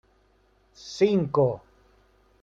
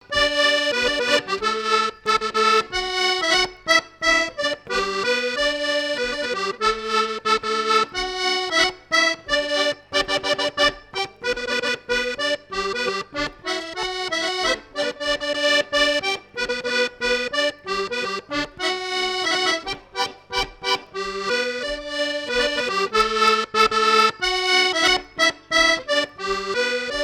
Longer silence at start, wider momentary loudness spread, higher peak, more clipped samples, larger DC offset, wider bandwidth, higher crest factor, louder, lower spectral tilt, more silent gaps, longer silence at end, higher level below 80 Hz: first, 0.85 s vs 0.1 s; first, 18 LU vs 8 LU; second, -10 dBFS vs -6 dBFS; neither; neither; second, 7.8 kHz vs 17 kHz; about the same, 18 dB vs 16 dB; second, -24 LUFS vs -21 LUFS; first, -7 dB/octave vs -1 dB/octave; neither; first, 0.85 s vs 0 s; second, -62 dBFS vs -48 dBFS